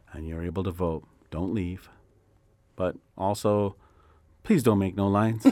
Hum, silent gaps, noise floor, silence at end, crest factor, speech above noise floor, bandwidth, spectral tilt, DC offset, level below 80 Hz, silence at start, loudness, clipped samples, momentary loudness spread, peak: none; none; -63 dBFS; 0 s; 22 dB; 37 dB; 16 kHz; -7.5 dB/octave; under 0.1%; -50 dBFS; 0.1 s; -27 LUFS; under 0.1%; 15 LU; -6 dBFS